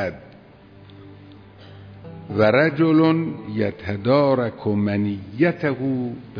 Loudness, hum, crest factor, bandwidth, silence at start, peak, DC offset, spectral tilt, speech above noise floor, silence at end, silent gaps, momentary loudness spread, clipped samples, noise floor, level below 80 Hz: -21 LUFS; none; 16 dB; 5.4 kHz; 0 s; -6 dBFS; under 0.1%; -9.5 dB/octave; 26 dB; 0 s; none; 13 LU; under 0.1%; -46 dBFS; -58 dBFS